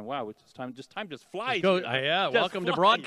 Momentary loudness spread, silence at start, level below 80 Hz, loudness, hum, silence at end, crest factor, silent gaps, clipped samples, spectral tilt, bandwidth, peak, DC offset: 16 LU; 0 s; -78 dBFS; -26 LUFS; none; 0 s; 20 dB; none; under 0.1%; -5 dB/octave; 12 kHz; -8 dBFS; under 0.1%